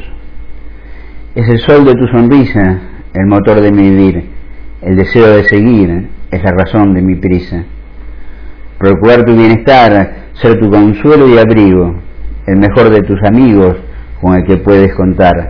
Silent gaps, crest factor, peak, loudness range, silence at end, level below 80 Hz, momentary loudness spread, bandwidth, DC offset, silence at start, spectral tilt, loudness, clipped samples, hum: none; 8 dB; 0 dBFS; 4 LU; 0 s; -26 dBFS; 14 LU; 5.4 kHz; under 0.1%; 0 s; -10 dB/octave; -7 LUFS; 4%; none